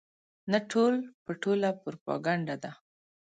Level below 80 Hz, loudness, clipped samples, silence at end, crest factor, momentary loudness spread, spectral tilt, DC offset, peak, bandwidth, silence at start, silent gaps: -78 dBFS; -31 LUFS; under 0.1%; 0.5 s; 20 dB; 13 LU; -6 dB/octave; under 0.1%; -12 dBFS; 9.2 kHz; 0.45 s; 1.14-1.26 s, 2.01-2.06 s